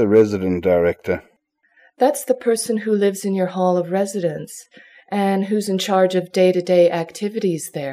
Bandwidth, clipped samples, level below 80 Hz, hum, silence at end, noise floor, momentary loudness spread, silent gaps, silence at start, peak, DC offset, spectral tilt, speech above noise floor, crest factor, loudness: 16 kHz; under 0.1%; -56 dBFS; none; 0 s; -60 dBFS; 10 LU; none; 0 s; -4 dBFS; under 0.1%; -5.5 dB/octave; 41 dB; 16 dB; -19 LUFS